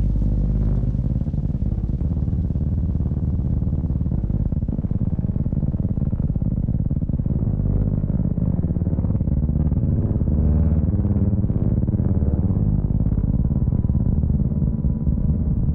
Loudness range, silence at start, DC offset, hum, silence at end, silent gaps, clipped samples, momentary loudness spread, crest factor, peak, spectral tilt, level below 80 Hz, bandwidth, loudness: 3 LU; 0 s; under 0.1%; none; 0 s; none; under 0.1%; 3 LU; 12 dB; -8 dBFS; -13.5 dB/octave; -24 dBFS; 1.9 kHz; -22 LUFS